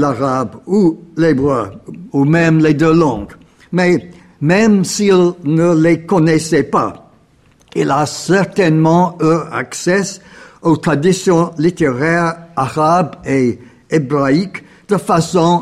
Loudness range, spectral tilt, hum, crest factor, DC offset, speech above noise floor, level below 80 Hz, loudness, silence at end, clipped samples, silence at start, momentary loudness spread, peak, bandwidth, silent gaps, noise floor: 2 LU; -6 dB/octave; none; 12 dB; 0.1%; 37 dB; -46 dBFS; -14 LUFS; 0 s; under 0.1%; 0 s; 9 LU; -2 dBFS; 13 kHz; none; -50 dBFS